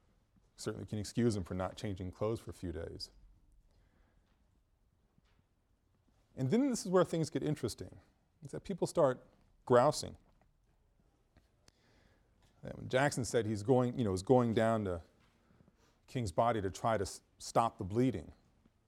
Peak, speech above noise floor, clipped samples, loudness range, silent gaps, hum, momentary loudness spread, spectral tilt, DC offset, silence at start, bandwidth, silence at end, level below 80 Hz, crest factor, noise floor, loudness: -14 dBFS; 41 dB; under 0.1%; 11 LU; none; none; 16 LU; -6 dB/octave; under 0.1%; 0.6 s; 16 kHz; 0.55 s; -62 dBFS; 24 dB; -75 dBFS; -35 LUFS